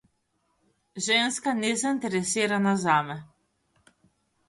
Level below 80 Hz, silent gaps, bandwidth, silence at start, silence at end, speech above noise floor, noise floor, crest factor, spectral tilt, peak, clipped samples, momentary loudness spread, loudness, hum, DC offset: -70 dBFS; none; 11.5 kHz; 0.95 s; 1.25 s; 48 dB; -73 dBFS; 20 dB; -3.5 dB/octave; -8 dBFS; under 0.1%; 12 LU; -25 LUFS; none; under 0.1%